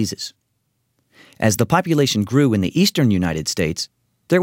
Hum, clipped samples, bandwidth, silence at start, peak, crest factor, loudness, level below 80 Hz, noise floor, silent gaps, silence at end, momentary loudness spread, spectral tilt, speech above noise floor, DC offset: none; under 0.1%; 16.5 kHz; 0 s; -2 dBFS; 18 dB; -18 LUFS; -48 dBFS; -70 dBFS; none; 0 s; 11 LU; -5 dB/octave; 52 dB; under 0.1%